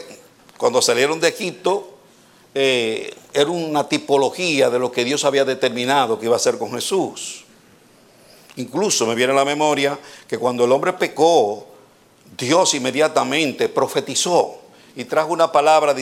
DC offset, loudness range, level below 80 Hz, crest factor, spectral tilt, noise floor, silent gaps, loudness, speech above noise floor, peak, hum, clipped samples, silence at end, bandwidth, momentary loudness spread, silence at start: under 0.1%; 3 LU; -70 dBFS; 18 dB; -3 dB/octave; -51 dBFS; none; -18 LUFS; 32 dB; -2 dBFS; none; under 0.1%; 0 s; 16.5 kHz; 12 LU; 0 s